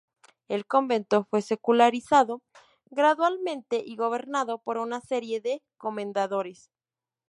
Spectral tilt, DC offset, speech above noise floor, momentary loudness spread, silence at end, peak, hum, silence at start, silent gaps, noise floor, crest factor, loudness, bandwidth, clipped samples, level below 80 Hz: -4.5 dB/octave; under 0.1%; over 64 dB; 12 LU; 0.75 s; -6 dBFS; none; 0.5 s; none; under -90 dBFS; 20 dB; -26 LUFS; 11.5 kHz; under 0.1%; -76 dBFS